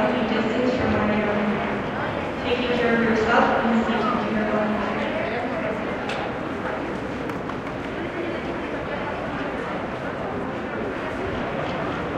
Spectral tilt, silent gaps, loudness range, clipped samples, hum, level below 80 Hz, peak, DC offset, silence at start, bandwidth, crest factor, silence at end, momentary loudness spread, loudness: -6.5 dB/octave; none; 7 LU; under 0.1%; none; -46 dBFS; -4 dBFS; under 0.1%; 0 s; 9.8 kHz; 20 dB; 0 s; 9 LU; -24 LUFS